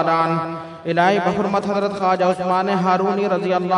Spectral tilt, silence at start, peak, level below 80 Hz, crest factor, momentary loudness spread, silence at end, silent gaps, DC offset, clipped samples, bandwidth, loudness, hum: -6.5 dB/octave; 0 s; -4 dBFS; -60 dBFS; 16 dB; 6 LU; 0 s; none; under 0.1%; under 0.1%; 10.5 kHz; -19 LUFS; none